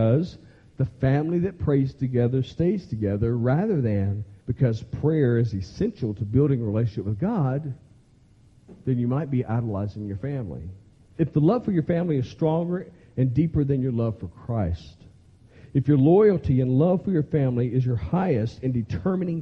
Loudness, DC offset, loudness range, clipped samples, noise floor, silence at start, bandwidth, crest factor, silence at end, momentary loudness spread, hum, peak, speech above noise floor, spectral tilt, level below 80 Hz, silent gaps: -24 LUFS; under 0.1%; 6 LU; under 0.1%; -55 dBFS; 0 s; 6.4 kHz; 16 dB; 0 s; 10 LU; none; -8 dBFS; 32 dB; -10 dB/octave; -48 dBFS; none